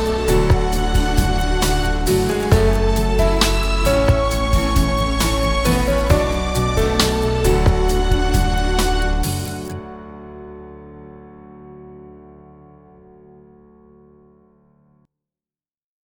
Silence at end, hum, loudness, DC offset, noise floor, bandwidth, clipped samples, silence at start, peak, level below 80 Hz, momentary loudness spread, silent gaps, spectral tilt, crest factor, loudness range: 3.9 s; none; -18 LUFS; under 0.1%; under -90 dBFS; 19 kHz; under 0.1%; 0 s; -2 dBFS; -22 dBFS; 20 LU; none; -5 dB/octave; 16 dB; 13 LU